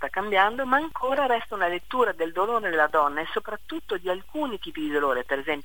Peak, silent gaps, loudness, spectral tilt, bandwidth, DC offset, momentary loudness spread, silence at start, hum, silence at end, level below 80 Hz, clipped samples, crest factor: -6 dBFS; none; -26 LUFS; -4.5 dB/octave; 18.5 kHz; 1%; 9 LU; 0 s; none; 0.05 s; -56 dBFS; under 0.1%; 20 dB